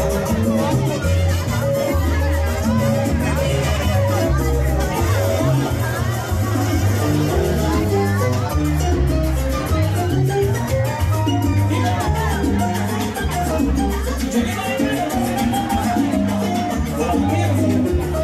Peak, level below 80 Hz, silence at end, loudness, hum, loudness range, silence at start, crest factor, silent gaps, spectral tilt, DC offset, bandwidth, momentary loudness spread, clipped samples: -6 dBFS; -26 dBFS; 0 s; -19 LUFS; none; 1 LU; 0 s; 10 dB; none; -6 dB/octave; under 0.1%; 15.5 kHz; 3 LU; under 0.1%